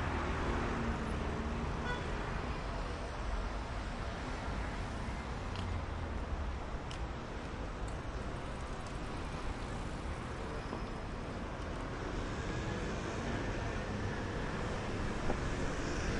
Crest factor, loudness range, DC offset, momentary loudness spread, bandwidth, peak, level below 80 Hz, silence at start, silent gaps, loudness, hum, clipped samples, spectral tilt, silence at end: 18 dB; 4 LU; under 0.1%; 5 LU; 11 kHz; -20 dBFS; -42 dBFS; 0 s; none; -40 LUFS; none; under 0.1%; -6 dB/octave; 0 s